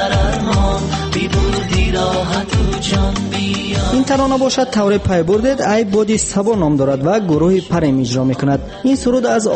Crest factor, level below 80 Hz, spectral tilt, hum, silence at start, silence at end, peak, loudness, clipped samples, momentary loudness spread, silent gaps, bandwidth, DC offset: 12 dB; -24 dBFS; -5.5 dB/octave; none; 0 s; 0 s; -2 dBFS; -15 LUFS; under 0.1%; 4 LU; none; 8.8 kHz; under 0.1%